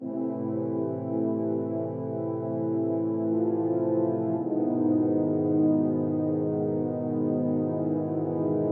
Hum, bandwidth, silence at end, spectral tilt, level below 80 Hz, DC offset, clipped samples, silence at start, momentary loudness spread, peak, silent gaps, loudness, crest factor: none; 2.3 kHz; 0 s; -14 dB/octave; -80 dBFS; under 0.1%; under 0.1%; 0 s; 6 LU; -14 dBFS; none; -27 LUFS; 12 dB